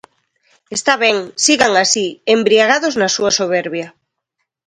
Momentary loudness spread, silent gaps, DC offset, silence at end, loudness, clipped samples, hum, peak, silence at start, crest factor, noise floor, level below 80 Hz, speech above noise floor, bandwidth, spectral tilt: 11 LU; none; under 0.1%; 0.8 s; -14 LUFS; under 0.1%; none; 0 dBFS; 0.7 s; 16 dB; -74 dBFS; -58 dBFS; 60 dB; 11 kHz; -2 dB/octave